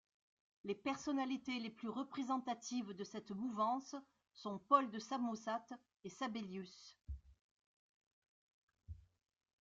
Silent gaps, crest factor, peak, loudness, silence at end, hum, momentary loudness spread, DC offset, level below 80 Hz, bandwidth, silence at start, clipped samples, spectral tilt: 7.41-7.57 s, 7.66-8.22 s, 8.28-8.68 s; 26 dB; -18 dBFS; -42 LUFS; 0.65 s; none; 18 LU; under 0.1%; -66 dBFS; 7.8 kHz; 0.65 s; under 0.1%; -4.5 dB/octave